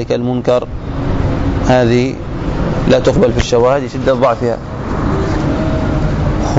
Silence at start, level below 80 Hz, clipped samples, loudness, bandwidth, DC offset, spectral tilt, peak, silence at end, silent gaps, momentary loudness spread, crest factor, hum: 0 s; -22 dBFS; under 0.1%; -14 LUFS; 7.8 kHz; under 0.1%; -7 dB/octave; -2 dBFS; 0 s; none; 8 LU; 12 dB; none